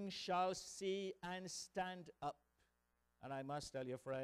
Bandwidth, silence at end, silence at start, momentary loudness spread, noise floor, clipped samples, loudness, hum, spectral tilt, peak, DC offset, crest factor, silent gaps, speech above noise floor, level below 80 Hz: 15 kHz; 0 s; 0 s; 10 LU; -84 dBFS; under 0.1%; -46 LUFS; 60 Hz at -75 dBFS; -4 dB/octave; -28 dBFS; under 0.1%; 18 dB; none; 38 dB; -76 dBFS